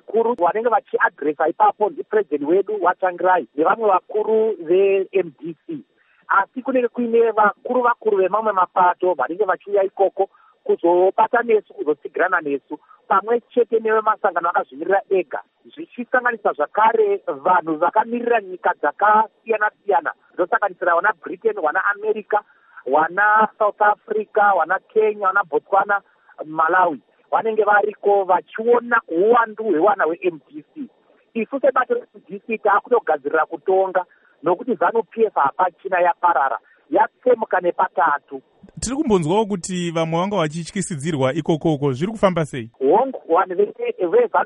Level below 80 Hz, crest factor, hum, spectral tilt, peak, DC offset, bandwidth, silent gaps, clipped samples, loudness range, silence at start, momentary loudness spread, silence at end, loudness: -58 dBFS; 18 dB; none; -5.5 dB/octave; -2 dBFS; under 0.1%; 10.5 kHz; none; under 0.1%; 3 LU; 0.1 s; 9 LU; 0 s; -19 LUFS